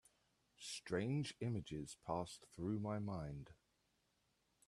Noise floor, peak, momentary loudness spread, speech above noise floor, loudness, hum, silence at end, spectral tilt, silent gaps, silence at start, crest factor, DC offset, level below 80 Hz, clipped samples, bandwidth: -82 dBFS; -28 dBFS; 10 LU; 38 dB; -46 LUFS; none; 1.15 s; -6 dB/octave; none; 0.6 s; 20 dB; under 0.1%; -70 dBFS; under 0.1%; 13 kHz